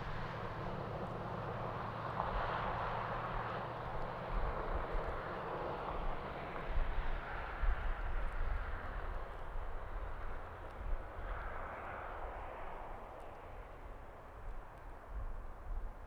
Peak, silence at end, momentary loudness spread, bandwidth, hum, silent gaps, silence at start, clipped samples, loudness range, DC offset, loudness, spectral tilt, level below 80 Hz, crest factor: -22 dBFS; 0 s; 12 LU; 5.8 kHz; none; none; 0 s; under 0.1%; 8 LU; under 0.1%; -44 LUFS; -7 dB/octave; -44 dBFS; 20 dB